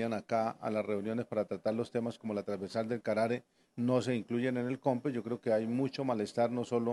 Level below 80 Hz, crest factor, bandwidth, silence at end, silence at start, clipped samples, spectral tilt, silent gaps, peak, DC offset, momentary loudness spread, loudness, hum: -80 dBFS; 18 dB; 12 kHz; 0 s; 0 s; under 0.1%; -7 dB/octave; none; -16 dBFS; under 0.1%; 5 LU; -34 LUFS; none